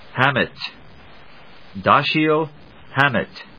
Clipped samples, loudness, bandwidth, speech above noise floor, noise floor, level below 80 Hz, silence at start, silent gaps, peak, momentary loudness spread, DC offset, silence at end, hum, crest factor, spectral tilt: under 0.1%; -19 LUFS; 5.4 kHz; 27 dB; -46 dBFS; -54 dBFS; 0.15 s; none; 0 dBFS; 15 LU; 0.5%; 0.15 s; none; 22 dB; -7 dB/octave